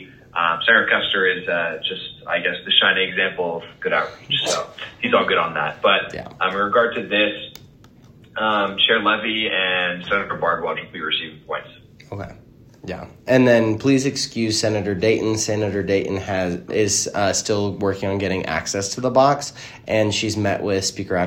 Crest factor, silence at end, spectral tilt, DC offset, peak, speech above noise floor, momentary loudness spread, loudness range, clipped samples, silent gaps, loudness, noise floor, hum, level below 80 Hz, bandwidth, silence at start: 20 dB; 0 s; -3.5 dB/octave; under 0.1%; 0 dBFS; 27 dB; 14 LU; 3 LU; under 0.1%; none; -20 LUFS; -48 dBFS; none; -56 dBFS; 16 kHz; 0 s